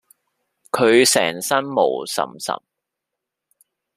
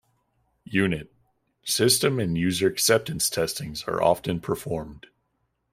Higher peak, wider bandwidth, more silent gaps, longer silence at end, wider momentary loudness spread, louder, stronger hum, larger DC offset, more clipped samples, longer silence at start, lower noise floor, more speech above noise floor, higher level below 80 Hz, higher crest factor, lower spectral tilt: first, -2 dBFS vs -6 dBFS; about the same, 15 kHz vs 16 kHz; neither; first, 1.4 s vs 0.75 s; about the same, 14 LU vs 12 LU; first, -18 LUFS vs -24 LUFS; neither; neither; neither; about the same, 0.75 s vs 0.7 s; first, -83 dBFS vs -74 dBFS; first, 64 dB vs 50 dB; second, -68 dBFS vs -54 dBFS; about the same, 20 dB vs 20 dB; about the same, -2.5 dB/octave vs -3.5 dB/octave